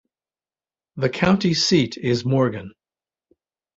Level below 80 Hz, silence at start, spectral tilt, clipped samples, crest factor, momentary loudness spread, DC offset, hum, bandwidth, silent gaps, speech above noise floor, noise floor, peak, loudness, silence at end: -54 dBFS; 0.95 s; -5.5 dB/octave; under 0.1%; 20 dB; 9 LU; under 0.1%; none; 8 kHz; none; over 70 dB; under -90 dBFS; -2 dBFS; -20 LUFS; 1.1 s